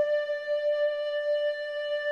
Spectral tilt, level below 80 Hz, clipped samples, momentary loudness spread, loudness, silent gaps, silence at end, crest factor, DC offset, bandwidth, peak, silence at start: -0.5 dB/octave; -76 dBFS; under 0.1%; 4 LU; -29 LUFS; none; 0 s; 10 dB; under 0.1%; 6.8 kHz; -18 dBFS; 0 s